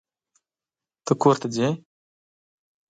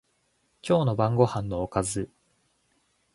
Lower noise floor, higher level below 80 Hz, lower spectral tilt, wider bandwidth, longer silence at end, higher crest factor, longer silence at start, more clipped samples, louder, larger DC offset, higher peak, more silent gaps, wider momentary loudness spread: first, under -90 dBFS vs -71 dBFS; second, -70 dBFS vs -52 dBFS; about the same, -6 dB/octave vs -6.5 dB/octave; second, 9.2 kHz vs 11.5 kHz; about the same, 1.1 s vs 1.1 s; about the same, 22 dB vs 22 dB; first, 1.05 s vs 0.65 s; neither; first, -23 LUFS vs -26 LUFS; neither; about the same, -4 dBFS vs -6 dBFS; neither; about the same, 14 LU vs 13 LU